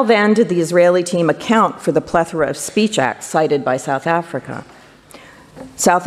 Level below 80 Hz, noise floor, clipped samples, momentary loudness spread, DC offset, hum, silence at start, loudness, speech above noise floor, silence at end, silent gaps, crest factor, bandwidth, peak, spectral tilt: -52 dBFS; -42 dBFS; under 0.1%; 8 LU; under 0.1%; none; 0 s; -16 LUFS; 26 dB; 0 s; none; 16 dB; 14.5 kHz; -2 dBFS; -4.5 dB/octave